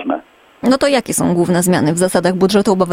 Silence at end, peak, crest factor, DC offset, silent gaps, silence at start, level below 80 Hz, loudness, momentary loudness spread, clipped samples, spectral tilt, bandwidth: 0 s; 0 dBFS; 14 dB; under 0.1%; none; 0 s; -48 dBFS; -14 LUFS; 6 LU; under 0.1%; -5 dB/octave; 16.5 kHz